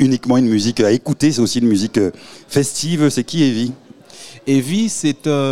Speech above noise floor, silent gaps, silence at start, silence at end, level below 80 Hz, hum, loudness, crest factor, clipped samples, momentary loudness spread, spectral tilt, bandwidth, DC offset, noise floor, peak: 23 dB; none; 0 s; 0 s; -54 dBFS; none; -16 LUFS; 14 dB; under 0.1%; 7 LU; -5 dB/octave; 15.5 kHz; 0.9%; -39 dBFS; -2 dBFS